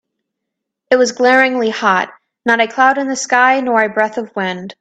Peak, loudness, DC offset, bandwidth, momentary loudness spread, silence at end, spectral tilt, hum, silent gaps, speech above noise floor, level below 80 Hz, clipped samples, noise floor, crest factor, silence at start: 0 dBFS; -14 LUFS; under 0.1%; 9.2 kHz; 10 LU; 0.1 s; -3 dB/octave; none; none; 64 dB; -64 dBFS; under 0.1%; -78 dBFS; 14 dB; 0.9 s